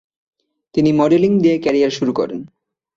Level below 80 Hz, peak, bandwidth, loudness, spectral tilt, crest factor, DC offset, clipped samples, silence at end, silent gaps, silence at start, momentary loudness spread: -54 dBFS; -2 dBFS; 7.6 kHz; -16 LUFS; -7 dB/octave; 14 dB; under 0.1%; under 0.1%; 0.5 s; none; 0.75 s; 10 LU